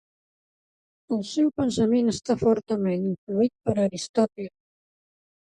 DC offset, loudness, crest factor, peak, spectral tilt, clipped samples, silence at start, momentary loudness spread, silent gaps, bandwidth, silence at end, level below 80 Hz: under 0.1%; -25 LUFS; 18 dB; -8 dBFS; -6.5 dB/octave; under 0.1%; 1.1 s; 7 LU; 3.18-3.27 s, 4.09-4.14 s; 11 kHz; 1 s; -58 dBFS